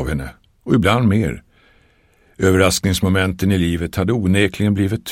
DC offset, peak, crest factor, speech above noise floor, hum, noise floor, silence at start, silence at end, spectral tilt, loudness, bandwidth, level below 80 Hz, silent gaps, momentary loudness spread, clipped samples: 0.1%; 0 dBFS; 18 dB; 39 dB; none; -55 dBFS; 0 s; 0 s; -5.5 dB/octave; -17 LUFS; 16.5 kHz; -36 dBFS; none; 10 LU; under 0.1%